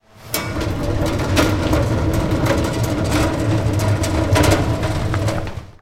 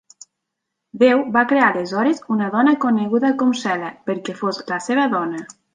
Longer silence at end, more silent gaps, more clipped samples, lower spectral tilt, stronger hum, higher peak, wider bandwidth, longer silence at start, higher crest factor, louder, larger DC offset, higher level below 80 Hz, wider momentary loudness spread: second, 0.1 s vs 0.3 s; neither; neither; about the same, -5.5 dB/octave vs -5.5 dB/octave; neither; about the same, 0 dBFS vs -2 dBFS; first, 17 kHz vs 9.6 kHz; second, 0.15 s vs 0.95 s; about the same, 18 dB vs 16 dB; about the same, -19 LUFS vs -19 LUFS; first, 0.3% vs under 0.1%; first, -28 dBFS vs -68 dBFS; second, 7 LU vs 10 LU